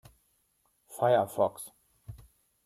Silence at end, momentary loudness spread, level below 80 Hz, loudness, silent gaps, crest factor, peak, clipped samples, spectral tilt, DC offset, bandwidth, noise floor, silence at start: 0.5 s; 24 LU; -64 dBFS; -28 LUFS; none; 20 dB; -14 dBFS; under 0.1%; -5.5 dB/octave; under 0.1%; 15 kHz; -73 dBFS; 0.9 s